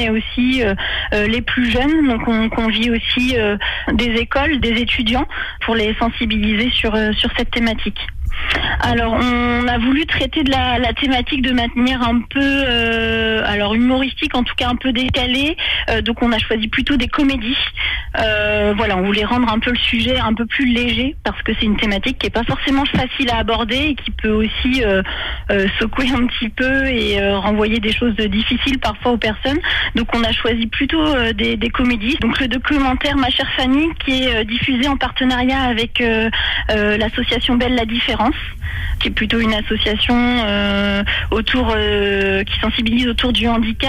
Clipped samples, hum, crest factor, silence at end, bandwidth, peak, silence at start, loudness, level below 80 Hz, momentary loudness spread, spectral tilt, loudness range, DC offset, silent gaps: under 0.1%; none; 10 dB; 0 s; 13 kHz; -6 dBFS; 0 s; -16 LUFS; -28 dBFS; 3 LU; -5.5 dB/octave; 1 LU; under 0.1%; none